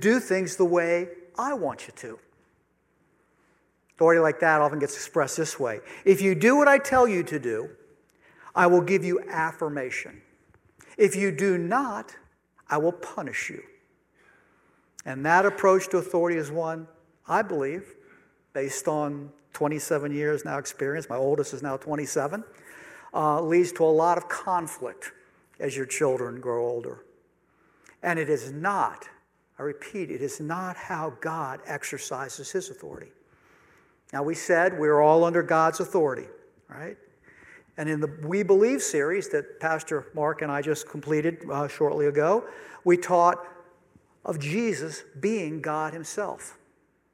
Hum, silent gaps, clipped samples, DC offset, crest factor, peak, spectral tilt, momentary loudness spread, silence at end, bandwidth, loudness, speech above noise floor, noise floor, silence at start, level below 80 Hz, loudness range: none; none; under 0.1%; under 0.1%; 22 dB; -4 dBFS; -5 dB/octave; 17 LU; 0.6 s; 16 kHz; -25 LUFS; 43 dB; -68 dBFS; 0 s; -70 dBFS; 9 LU